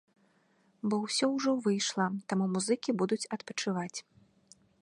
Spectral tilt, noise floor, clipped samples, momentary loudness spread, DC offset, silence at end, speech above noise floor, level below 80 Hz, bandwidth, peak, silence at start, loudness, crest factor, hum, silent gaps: -4.5 dB/octave; -69 dBFS; under 0.1%; 7 LU; under 0.1%; 0.8 s; 38 dB; -80 dBFS; 11.5 kHz; -16 dBFS; 0.85 s; -32 LUFS; 18 dB; none; none